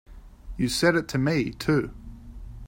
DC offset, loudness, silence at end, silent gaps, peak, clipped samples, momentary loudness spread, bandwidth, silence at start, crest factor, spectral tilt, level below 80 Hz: under 0.1%; -25 LUFS; 0 s; none; -6 dBFS; under 0.1%; 22 LU; 16.5 kHz; 0.1 s; 20 dB; -5.5 dB/octave; -44 dBFS